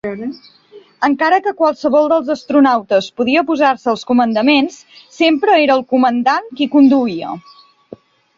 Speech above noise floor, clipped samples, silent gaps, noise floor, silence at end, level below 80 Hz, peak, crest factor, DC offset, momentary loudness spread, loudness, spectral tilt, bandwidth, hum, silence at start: 26 dB; under 0.1%; none; -39 dBFS; 1 s; -60 dBFS; -2 dBFS; 14 dB; under 0.1%; 10 LU; -14 LUFS; -5 dB/octave; 7.4 kHz; none; 0.05 s